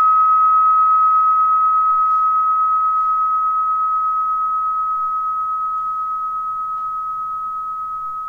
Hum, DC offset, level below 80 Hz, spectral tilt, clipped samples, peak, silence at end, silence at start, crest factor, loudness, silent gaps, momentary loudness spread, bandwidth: none; 0.2%; -58 dBFS; -4 dB/octave; under 0.1%; -8 dBFS; 0 s; 0 s; 8 dB; -16 LUFS; none; 11 LU; 2.7 kHz